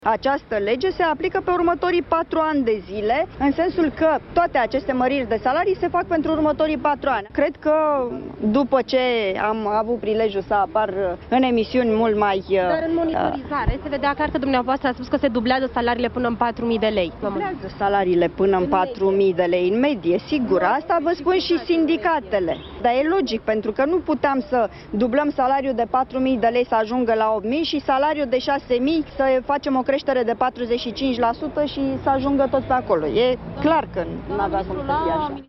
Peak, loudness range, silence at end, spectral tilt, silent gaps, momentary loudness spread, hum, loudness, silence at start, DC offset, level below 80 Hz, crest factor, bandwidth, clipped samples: -4 dBFS; 2 LU; 0.05 s; -7 dB/octave; none; 4 LU; none; -21 LUFS; 0 s; under 0.1%; -42 dBFS; 16 dB; 6 kHz; under 0.1%